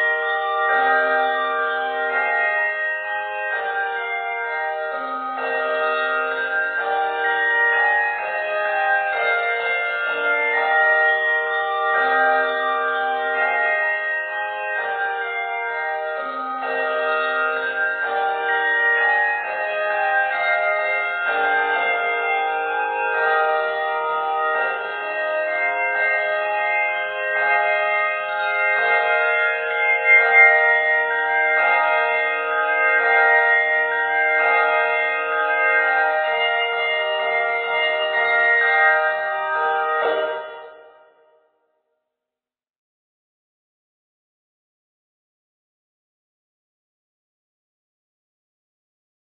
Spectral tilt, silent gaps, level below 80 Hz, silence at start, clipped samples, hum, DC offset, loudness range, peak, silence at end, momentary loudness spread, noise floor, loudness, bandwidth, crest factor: -4.5 dB/octave; none; -70 dBFS; 0 s; under 0.1%; none; under 0.1%; 7 LU; 0 dBFS; 8.45 s; 8 LU; -87 dBFS; -19 LUFS; 4.6 kHz; 20 dB